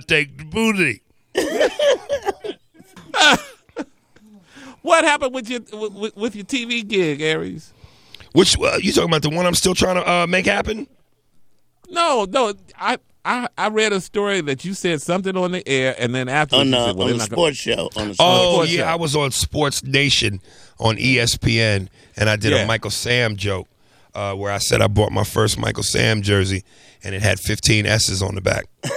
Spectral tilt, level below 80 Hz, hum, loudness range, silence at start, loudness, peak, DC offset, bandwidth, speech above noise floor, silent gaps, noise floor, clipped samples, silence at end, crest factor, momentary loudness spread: -4 dB/octave; -42 dBFS; none; 4 LU; 0 s; -18 LUFS; 0 dBFS; under 0.1%; 16 kHz; 35 dB; none; -53 dBFS; under 0.1%; 0 s; 20 dB; 12 LU